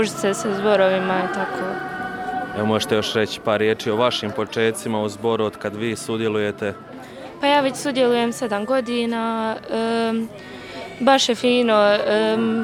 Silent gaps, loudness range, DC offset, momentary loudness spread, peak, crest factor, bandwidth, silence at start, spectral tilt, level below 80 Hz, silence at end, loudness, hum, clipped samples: none; 3 LU; under 0.1%; 11 LU; -2 dBFS; 18 dB; 16 kHz; 0 s; -4.5 dB/octave; -58 dBFS; 0 s; -21 LUFS; none; under 0.1%